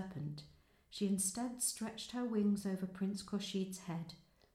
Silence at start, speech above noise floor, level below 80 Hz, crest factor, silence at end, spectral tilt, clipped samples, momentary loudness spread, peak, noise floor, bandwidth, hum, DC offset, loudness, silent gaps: 0 s; 25 dB; -72 dBFS; 16 dB; 0.35 s; -4.5 dB/octave; under 0.1%; 11 LU; -24 dBFS; -65 dBFS; 14.5 kHz; none; under 0.1%; -39 LUFS; none